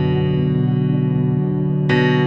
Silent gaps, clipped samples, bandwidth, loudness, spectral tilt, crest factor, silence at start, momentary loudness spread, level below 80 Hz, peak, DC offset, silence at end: none; under 0.1%; 5.6 kHz; -18 LUFS; -9 dB/octave; 12 dB; 0 s; 3 LU; -46 dBFS; -4 dBFS; under 0.1%; 0 s